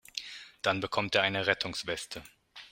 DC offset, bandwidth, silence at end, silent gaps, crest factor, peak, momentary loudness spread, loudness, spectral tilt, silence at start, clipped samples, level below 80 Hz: under 0.1%; 16 kHz; 0.05 s; none; 26 dB; -8 dBFS; 17 LU; -31 LUFS; -3.5 dB/octave; 0.15 s; under 0.1%; -64 dBFS